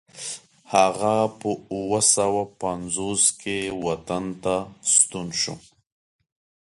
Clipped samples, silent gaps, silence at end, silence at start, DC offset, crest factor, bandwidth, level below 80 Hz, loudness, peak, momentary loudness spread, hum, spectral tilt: under 0.1%; none; 1.05 s; 0.15 s; under 0.1%; 22 dB; 11.5 kHz; -56 dBFS; -22 LUFS; -4 dBFS; 12 LU; none; -2.5 dB/octave